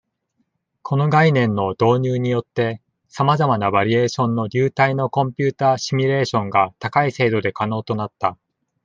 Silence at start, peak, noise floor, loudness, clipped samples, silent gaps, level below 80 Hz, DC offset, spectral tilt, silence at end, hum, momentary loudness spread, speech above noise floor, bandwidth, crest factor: 0.85 s; -2 dBFS; -70 dBFS; -19 LUFS; under 0.1%; none; -60 dBFS; under 0.1%; -6.5 dB/octave; 0.5 s; none; 7 LU; 52 dB; 7.6 kHz; 18 dB